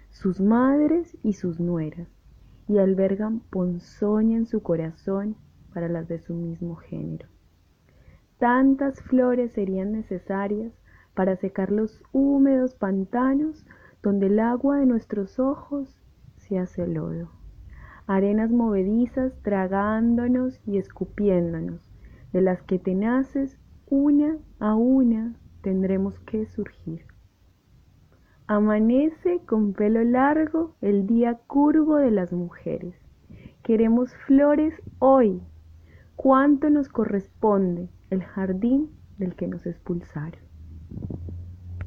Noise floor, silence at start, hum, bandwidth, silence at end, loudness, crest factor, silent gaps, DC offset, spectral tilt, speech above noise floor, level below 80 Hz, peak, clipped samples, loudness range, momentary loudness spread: -59 dBFS; 0.2 s; none; 6.6 kHz; 0 s; -24 LUFS; 18 dB; none; under 0.1%; -10 dB/octave; 37 dB; -50 dBFS; -6 dBFS; under 0.1%; 7 LU; 15 LU